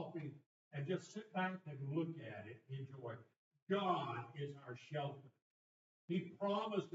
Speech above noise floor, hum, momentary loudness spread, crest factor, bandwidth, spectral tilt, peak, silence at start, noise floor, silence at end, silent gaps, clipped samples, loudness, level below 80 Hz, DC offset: over 46 dB; none; 13 LU; 20 dB; 7.6 kHz; -5.5 dB/octave; -26 dBFS; 0 s; under -90 dBFS; 0 s; 0.46-0.71 s, 3.36-3.51 s, 3.62-3.67 s, 5.42-6.08 s; under 0.1%; -45 LUFS; under -90 dBFS; under 0.1%